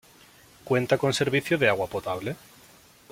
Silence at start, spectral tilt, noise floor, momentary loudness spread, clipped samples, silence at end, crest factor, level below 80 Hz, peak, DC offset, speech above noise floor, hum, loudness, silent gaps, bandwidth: 0.65 s; -5 dB/octave; -54 dBFS; 10 LU; under 0.1%; 0.75 s; 20 dB; -60 dBFS; -6 dBFS; under 0.1%; 29 dB; none; -25 LUFS; none; 16.5 kHz